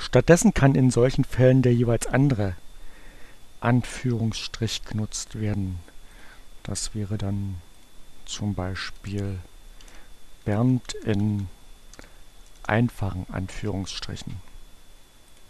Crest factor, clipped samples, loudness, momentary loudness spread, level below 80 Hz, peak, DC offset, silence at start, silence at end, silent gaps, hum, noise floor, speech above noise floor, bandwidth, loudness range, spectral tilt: 24 dB; under 0.1%; -25 LUFS; 16 LU; -42 dBFS; -2 dBFS; under 0.1%; 0 s; 0.05 s; none; none; -48 dBFS; 25 dB; 13 kHz; 10 LU; -6 dB/octave